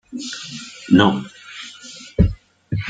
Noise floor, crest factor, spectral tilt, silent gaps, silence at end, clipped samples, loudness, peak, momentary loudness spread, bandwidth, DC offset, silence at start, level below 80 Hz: -39 dBFS; 20 dB; -6 dB/octave; none; 0 s; under 0.1%; -19 LUFS; -2 dBFS; 20 LU; 9.2 kHz; under 0.1%; 0.1 s; -34 dBFS